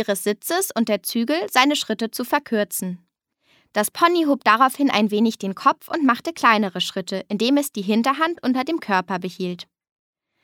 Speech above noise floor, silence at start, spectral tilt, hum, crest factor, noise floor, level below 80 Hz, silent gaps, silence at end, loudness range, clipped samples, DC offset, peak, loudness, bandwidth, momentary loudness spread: 45 dB; 0 s; -3.5 dB/octave; none; 22 dB; -65 dBFS; -74 dBFS; none; 0.8 s; 4 LU; under 0.1%; under 0.1%; 0 dBFS; -21 LUFS; 18.5 kHz; 10 LU